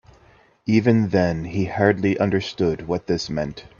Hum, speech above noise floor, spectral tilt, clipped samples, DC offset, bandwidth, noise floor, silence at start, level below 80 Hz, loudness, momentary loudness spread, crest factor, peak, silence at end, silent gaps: none; 34 dB; -7 dB/octave; under 0.1%; under 0.1%; 7.2 kHz; -54 dBFS; 0.65 s; -50 dBFS; -21 LUFS; 9 LU; 20 dB; -2 dBFS; 0.15 s; none